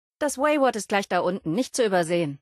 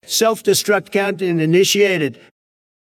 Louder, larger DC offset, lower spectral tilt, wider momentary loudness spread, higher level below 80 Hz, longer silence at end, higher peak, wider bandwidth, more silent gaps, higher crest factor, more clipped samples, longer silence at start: second, -24 LUFS vs -16 LUFS; neither; about the same, -4.5 dB/octave vs -3.5 dB/octave; about the same, 5 LU vs 6 LU; about the same, -66 dBFS vs -68 dBFS; second, 0.05 s vs 0.7 s; second, -8 dBFS vs -2 dBFS; second, 12.5 kHz vs 16 kHz; neither; about the same, 16 dB vs 14 dB; neither; about the same, 0.2 s vs 0.1 s